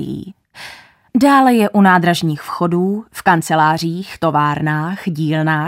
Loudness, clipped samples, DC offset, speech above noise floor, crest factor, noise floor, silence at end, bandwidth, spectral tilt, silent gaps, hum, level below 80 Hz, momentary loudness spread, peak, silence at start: -15 LUFS; under 0.1%; under 0.1%; 24 dB; 14 dB; -39 dBFS; 0 s; 16 kHz; -6 dB/octave; none; none; -54 dBFS; 15 LU; 0 dBFS; 0 s